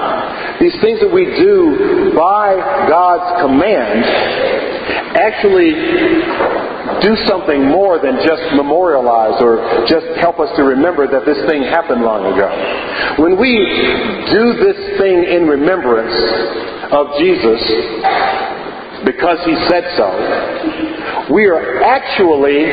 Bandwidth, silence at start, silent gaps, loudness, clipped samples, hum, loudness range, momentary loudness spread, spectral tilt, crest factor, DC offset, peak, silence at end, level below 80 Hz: 5 kHz; 0 s; none; -12 LUFS; under 0.1%; none; 3 LU; 7 LU; -8 dB/octave; 12 dB; under 0.1%; 0 dBFS; 0 s; -42 dBFS